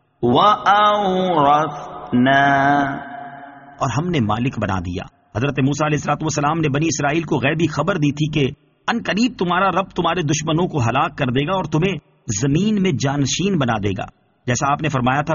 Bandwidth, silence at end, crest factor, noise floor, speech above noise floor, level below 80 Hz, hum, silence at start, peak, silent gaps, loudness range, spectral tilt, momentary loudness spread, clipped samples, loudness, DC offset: 7.4 kHz; 0 s; 16 dB; -38 dBFS; 21 dB; -46 dBFS; none; 0.2 s; -2 dBFS; none; 4 LU; -4.5 dB/octave; 11 LU; under 0.1%; -18 LUFS; under 0.1%